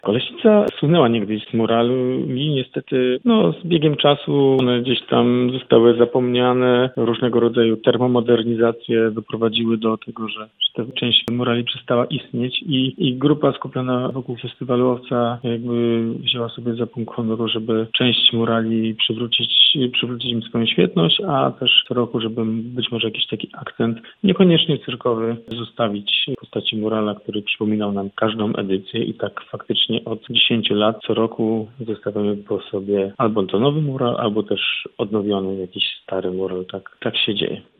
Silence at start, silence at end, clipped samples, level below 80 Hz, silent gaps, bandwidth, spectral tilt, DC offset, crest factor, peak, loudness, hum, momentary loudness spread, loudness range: 0.05 s; 0.2 s; under 0.1%; -60 dBFS; none; 4.5 kHz; -8.5 dB/octave; under 0.1%; 18 dB; 0 dBFS; -19 LUFS; none; 10 LU; 5 LU